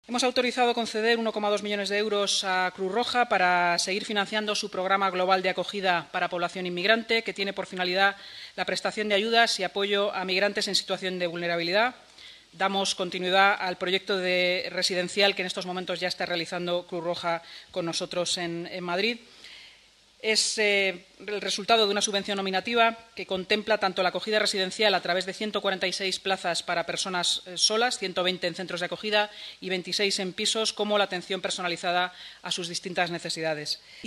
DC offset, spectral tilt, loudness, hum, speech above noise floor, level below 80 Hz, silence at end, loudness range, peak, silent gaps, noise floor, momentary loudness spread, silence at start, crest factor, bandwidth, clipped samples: under 0.1%; -2.5 dB/octave; -26 LUFS; none; 30 dB; -70 dBFS; 0 s; 3 LU; -6 dBFS; none; -57 dBFS; 9 LU; 0.1 s; 22 dB; 14.5 kHz; under 0.1%